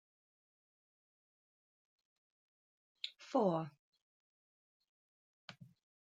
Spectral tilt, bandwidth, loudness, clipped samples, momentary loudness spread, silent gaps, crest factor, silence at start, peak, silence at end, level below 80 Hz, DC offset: -7 dB/octave; 9 kHz; -39 LUFS; under 0.1%; 23 LU; 3.79-3.93 s, 4.02-4.80 s, 4.89-5.48 s; 26 dB; 3.05 s; -20 dBFS; 0.45 s; under -90 dBFS; under 0.1%